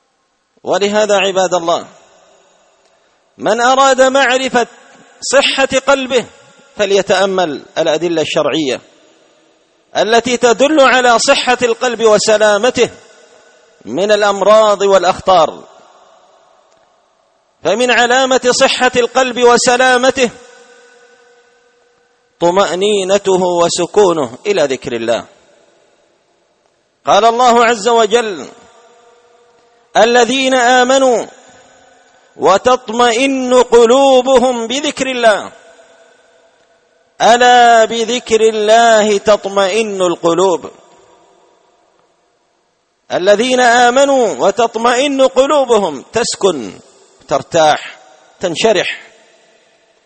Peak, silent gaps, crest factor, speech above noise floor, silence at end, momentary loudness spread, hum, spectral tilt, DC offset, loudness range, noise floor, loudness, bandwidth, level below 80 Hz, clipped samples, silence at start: 0 dBFS; none; 12 dB; 50 dB; 1.05 s; 10 LU; none; -2.5 dB/octave; under 0.1%; 5 LU; -61 dBFS; -11 LUFS; 8.8 kHz; -52 dBFS; under 0.1%; 0.65 s